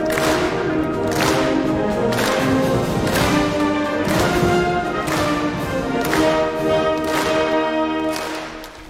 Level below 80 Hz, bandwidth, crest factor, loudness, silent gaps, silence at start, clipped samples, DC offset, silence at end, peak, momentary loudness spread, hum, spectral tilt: -38 dBFS; 17 kHz; 16 dB; -19 LUFS; none; 0 s; under 0.1%; under 0.1%; 0 s; -4 dBFS; 5 LU; none; -5 dB/octave